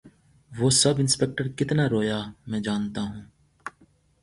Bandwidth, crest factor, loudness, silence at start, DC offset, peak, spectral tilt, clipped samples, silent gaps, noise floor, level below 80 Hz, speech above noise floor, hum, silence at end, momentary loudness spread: 11.5 kHz; 18 dB; -24 LUFS; 0.05 s; under 0.1%; -8 dBFS; -4 dB/octave; under 0.1%; none; -61 dBFS; -56 dBFS; 36 dB; none; 0.55 s; 22 LU